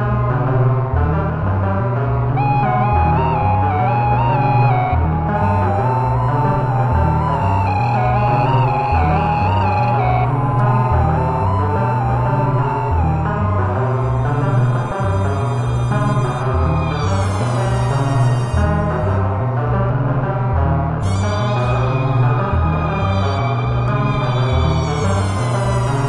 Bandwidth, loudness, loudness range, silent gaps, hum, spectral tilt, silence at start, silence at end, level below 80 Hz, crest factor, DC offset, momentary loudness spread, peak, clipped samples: 11 kHz; -17 LUFS; 2 LU; none; none; -8 dB/octave; 0 s; 0 s; -30 dBFS; 14 dB; 0.2%; 3 LU; -2 dBFS; under 0.1%